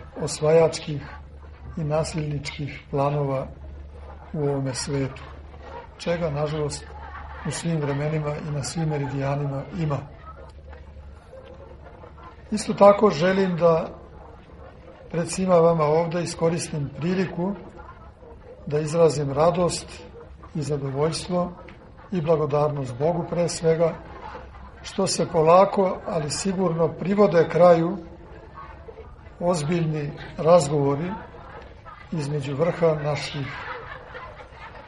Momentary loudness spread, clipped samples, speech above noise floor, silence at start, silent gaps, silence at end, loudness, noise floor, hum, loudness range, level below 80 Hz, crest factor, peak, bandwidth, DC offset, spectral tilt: 24 LU; under 0.1%; 22 dB; 0 s; none; 0 s; -23 LUFS; -44 dBFS; none; 7 LU; -46 dBFS; 22 dB; -2 dBFS; 11.5 kHz; under 0.1%; -6 dB/octave